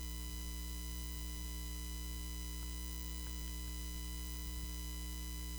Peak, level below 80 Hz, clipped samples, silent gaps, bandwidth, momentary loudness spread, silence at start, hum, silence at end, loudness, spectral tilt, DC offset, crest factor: -26 dBFS; -44 dBFS; under 0.1%; none; over 20 kHz; 0 LU; 0 s; 60 Hz at -45 dBFS; 0 s; -44 LUFS; -3.5 dB/octave; under 0.1%; 16 dB